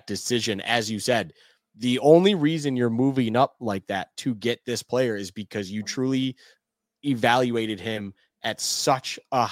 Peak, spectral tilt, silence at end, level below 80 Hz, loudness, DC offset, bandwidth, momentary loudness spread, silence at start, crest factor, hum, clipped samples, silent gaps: -4 dBFS; -4.5 dB/octave; 0 s; -68 dBFS; -24 LUFS; under 0.1%; 16.5 kHz; 11 LU; 0.05 s; 22 dB; none; under 0.1%; none